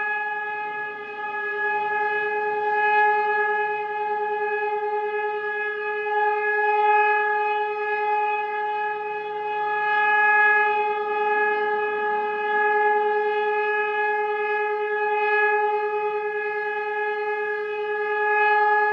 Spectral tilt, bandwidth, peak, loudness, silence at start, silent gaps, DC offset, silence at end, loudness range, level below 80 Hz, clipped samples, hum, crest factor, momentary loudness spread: -4 dB/octave; 5.6 kHz; -8 dBFS; -23 LUFS; 0 s; none; under 0.1%; 0 s; 3 LU; -76 dBFS; under 0.1%; none; 14 dB; 8 LU